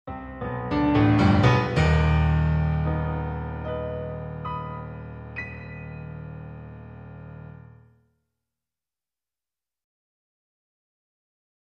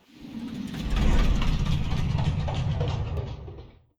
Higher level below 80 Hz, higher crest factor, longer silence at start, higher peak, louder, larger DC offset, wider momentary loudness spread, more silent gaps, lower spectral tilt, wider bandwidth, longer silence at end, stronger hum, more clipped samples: second, -36 dBFS vs -28 dBFS; first, 22 dB vs 14 dB; about the same, 0.05 s vs 0.15 s; first, -6 dBFS vs -12 dBFS; first, -24 LUFS vs -28 LUFS; neither; first, 22 LU vs 14 LU; neither; first, -8 dB/octave vs -6.5 dB/octave; second, 8.2 kHz vs 10.5 kHz; first, 4.15 s vs 0.3 s; neither; neither